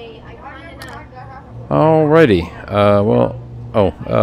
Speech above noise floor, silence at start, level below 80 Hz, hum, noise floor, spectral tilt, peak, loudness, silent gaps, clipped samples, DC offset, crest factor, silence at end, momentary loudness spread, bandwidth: 22 dB; 0 s; -40 dBFS; none; -34 dBFS; -8.5 dB/octave; 0 dBFS; -14 LUFS; none; under 0.1%; under 0.1%; 16 dB; 0 s; 23 LU; 12 kHz